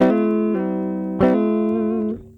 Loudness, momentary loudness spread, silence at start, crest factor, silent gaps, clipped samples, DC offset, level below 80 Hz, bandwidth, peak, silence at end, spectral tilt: -20 LUFS; 7 LU; 0 s; 16 dB; none; under 0.1%; under 0.1%; -48 dBFS; 5.2 kHz; -4 dBFS; 0.1 s; -9.5 dB/octave